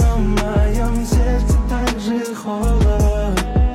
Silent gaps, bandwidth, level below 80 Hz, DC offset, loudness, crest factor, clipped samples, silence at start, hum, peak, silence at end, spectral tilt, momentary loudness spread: none; 14 kHz; -18 dBFS; under 0.1%; -18 LUFS; 10 dB; under 0.1%; 0 s; none; -6 dBFS; 0 s; -6.5 dB/octave; 5 LU